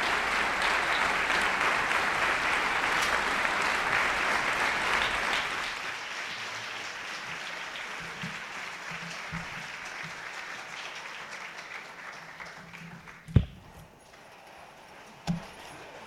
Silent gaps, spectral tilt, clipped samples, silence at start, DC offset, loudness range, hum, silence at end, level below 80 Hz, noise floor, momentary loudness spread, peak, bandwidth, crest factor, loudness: none; -3 dB/octave; under 0.1%; 0 s; under 0.1%; 12 LU; none; 0 s; -50 dBFS; -52 dBFS; 19 LU; -6 dBFS; 16.5 kHz; 26 dB; -29 LUFS